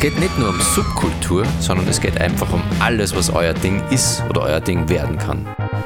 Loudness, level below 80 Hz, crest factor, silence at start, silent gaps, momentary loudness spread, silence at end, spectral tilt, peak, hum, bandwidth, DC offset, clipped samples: -18 LUFS; -30 dBFS; 16 dB; 0 s; none; 4 LU; 0 s; -4.5 dB/octave; -2 dBFS; none; 18 kHz; under 0.1%; under 0.1%